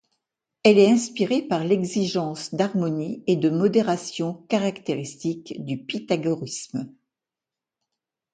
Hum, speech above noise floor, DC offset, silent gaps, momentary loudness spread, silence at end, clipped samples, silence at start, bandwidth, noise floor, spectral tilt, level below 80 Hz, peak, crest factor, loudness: none; 66 dB; under 0.1%; none; 13 LU; 1.45 s; under 0.1%; 0.65 s; 9.4 kHz; -89 dBFS; -5.5 dB/octave; -68 dBFS; -4 dBFS; 20 dB; -23 LUFS